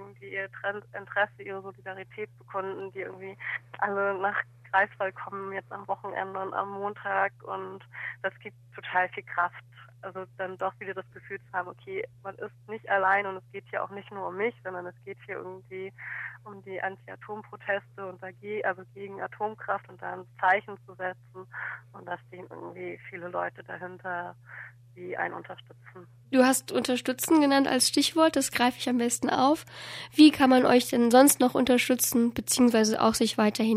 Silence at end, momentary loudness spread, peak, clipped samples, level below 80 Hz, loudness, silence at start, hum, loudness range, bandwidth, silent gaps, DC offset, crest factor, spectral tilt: 0 s; 19 LU; -6 dBFS; under 0.1%; -68 dBFS; -27 LUFS; 0 s; none; 15 LU; 15.5 kHz; none; under 0.1%; 22 dB; -3 dB/octave